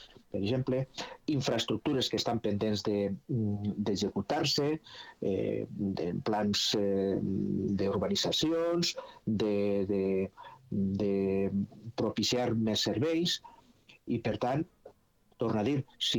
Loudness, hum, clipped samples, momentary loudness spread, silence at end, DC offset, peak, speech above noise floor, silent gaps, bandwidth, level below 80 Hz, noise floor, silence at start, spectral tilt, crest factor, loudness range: -32 LUFS; none; under 0.1%; 7 LU; 0 s; under 0.1%; -16 dBFS; 34 dB; none; 19 kHz; -62 dBFS; -65 dBFS; 0 s; -5 dB/octave; 14 dB; 2 LU